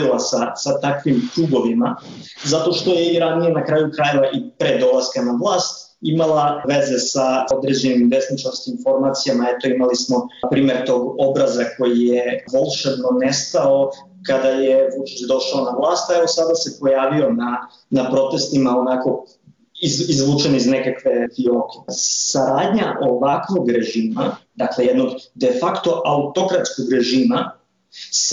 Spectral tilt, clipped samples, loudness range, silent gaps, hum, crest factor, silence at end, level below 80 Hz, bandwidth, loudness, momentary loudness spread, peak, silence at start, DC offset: -4.5 dB/octave; under 0.1%; 1 LU; none; none; 10 dB; 0 s; -60 dBFS; 7.8 kHz; -18 LUFS; 6 LU; -8 dBFS; 0 s; under 0.1%